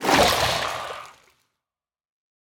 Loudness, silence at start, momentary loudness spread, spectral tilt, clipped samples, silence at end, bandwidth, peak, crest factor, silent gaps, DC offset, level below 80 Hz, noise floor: -21 LUFS; 0 s; 18 LU; -2.5 dB/octave; under 0.1%; 1.4 s; 19.5 kHz; -4 dBFS; 20 dB; none; under 0.1%; -46 dBFS; under -90 dBFS